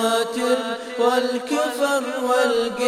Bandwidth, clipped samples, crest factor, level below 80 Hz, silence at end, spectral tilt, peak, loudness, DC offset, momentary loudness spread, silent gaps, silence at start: 15.5 kHz; under 0.1%; 14 dB; -64 dBFS; 0 s; -2.5 dB/octave; -6 dBFS; -21 LUFS; under 0.1%; 4 LU; none; 0 s